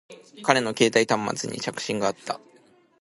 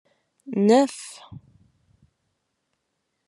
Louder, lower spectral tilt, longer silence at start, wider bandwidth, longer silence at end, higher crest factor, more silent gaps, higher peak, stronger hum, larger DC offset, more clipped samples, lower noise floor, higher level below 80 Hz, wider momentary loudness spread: second, -24 LUFS vs -21 LUFS; second, -3.5 dB/octave vs -5.5 dB/octave; second, 0.1 s vs 0.5 s; about the same, 11.5 kHz vs 12 kHz; second, 0.65 s vs 1.9 s; about the same, 24 dB vs 22 dB; neither; about the same, -2 dBFS vs -4 dBFS; neither; neither; neither; second, -58 dBFS vs -77 dBFS; first, -66 dBFS vs -72 dBFS; second, 12 LU vs 22 LU